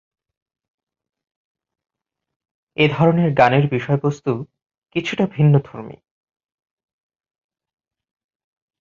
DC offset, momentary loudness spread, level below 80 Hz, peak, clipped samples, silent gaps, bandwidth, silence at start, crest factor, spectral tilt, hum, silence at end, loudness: under 0.1%; 19 LU; -56 dBFS; -2 dBFS; under 0.1%; 4.66-4.70 s, 4.78-4.82 s; 7.2 kHz; 2.8 s; 20 dB; -8 dB/octave; none; 2.9 s; -18 LUFS